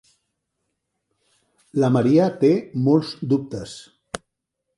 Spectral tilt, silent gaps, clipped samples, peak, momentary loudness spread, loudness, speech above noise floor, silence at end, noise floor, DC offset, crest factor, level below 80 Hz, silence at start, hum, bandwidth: -7.5 dB/octave; none; under 0.1%; -4 dBFS; 19 LU; -20 LUFS; 60 dB; 0.6 s; -79 dBFS; under 0.1%; 18 dB; -60 dBFS; 1.75 s; none; 11.5 kHz